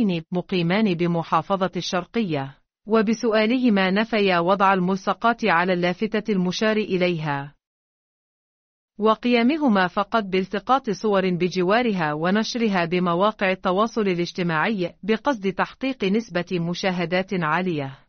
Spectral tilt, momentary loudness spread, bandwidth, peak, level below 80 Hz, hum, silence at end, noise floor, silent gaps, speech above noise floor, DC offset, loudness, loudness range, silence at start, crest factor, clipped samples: -4.5 dB/octave; 6 LU; 6.6 kHz; -6 dBFS; -58 dBFS; none; 0.15 s; under -90 dBFS; 7.67-8.88 s; over 68 dB; under 0.1%; -22 LUFS; 4 LU; 0 s; 16 dB; under 0.1%